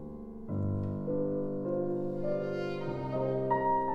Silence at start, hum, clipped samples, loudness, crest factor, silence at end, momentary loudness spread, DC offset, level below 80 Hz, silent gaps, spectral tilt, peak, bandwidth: 0 s; none; under 0.1%; -33 LUFS; 16 dB; 0 s; 6 LU; under 0.1%; -54 dBFS; none; -9.5 dB/octave; -18 dBFS; 7 kHz